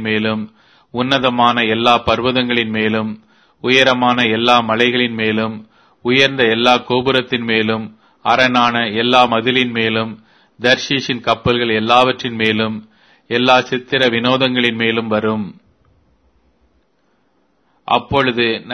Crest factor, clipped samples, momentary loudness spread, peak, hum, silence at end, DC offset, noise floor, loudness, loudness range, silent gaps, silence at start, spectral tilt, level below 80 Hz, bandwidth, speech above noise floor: 16 dB; under 0.1%; 11 LU; 0 dBFS; none; 0 s; under 0.1%; -61 dBFS; -15 LUFS; 5 LU; none; 0 s; -5 dB/octave; -48 dBFS; 11 kHz; 46 dB